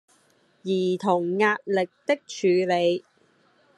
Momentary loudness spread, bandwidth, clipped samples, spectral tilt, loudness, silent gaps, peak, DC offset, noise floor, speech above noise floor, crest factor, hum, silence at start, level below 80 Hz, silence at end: 6 LU; 11 kHz; under 0.1%; -5.5 dB/octave; -24 LUFS; none; -8 dBFS; under 0.1%; -63 dBFS; 39 dB; 18 dB; none; 0.65 s; -78 dBFS; 0.75 s